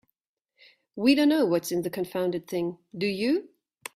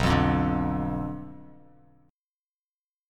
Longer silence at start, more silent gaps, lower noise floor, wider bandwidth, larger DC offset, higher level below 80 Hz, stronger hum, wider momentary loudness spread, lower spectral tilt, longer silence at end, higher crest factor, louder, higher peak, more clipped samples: first, 0.95 s vs 0 s; neither; second, -80 dBFS vs under -90 dBFS; first, 16 kHz vs 14 kHz; neither; second, -70 dBFS vs -40 dBFS; neither; second, 11 LU vs 21 LU; second, -5 dB/octave vs -7 dB/octave; second, 0.5 s vs 1.65 s; about the same, 18 dB vs 20 dB; about the same, -26 LUFS vs -27 LUFS; about the same, -10 dBFS vs -10 dBFS; neither